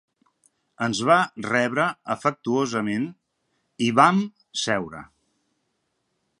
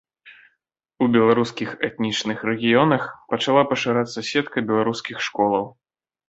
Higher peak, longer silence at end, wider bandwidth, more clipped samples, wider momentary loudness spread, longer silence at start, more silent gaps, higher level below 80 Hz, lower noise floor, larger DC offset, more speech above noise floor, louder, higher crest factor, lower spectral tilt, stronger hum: about the same, -2 dBFS vs -2 dBFS; first, 1.35 s vs 0.6 s; first, 11.5 kHz vs 8 kHz; neither; about the same, 11 LU vs 9 LU; first, 0.8 s vs 0.25 s; neither; about the same, -66 dBFS vs -62 dBFS; about the same, -74 dBFS vs -74 dBFS; neither; about the same, 52 dB vs 54 dB; about the same, -23 LUFS vs -21 LUFS; about the same, 24 dB vs 20 dB; about the same, -4.5 dB/octave vs -5 dB/octave; neither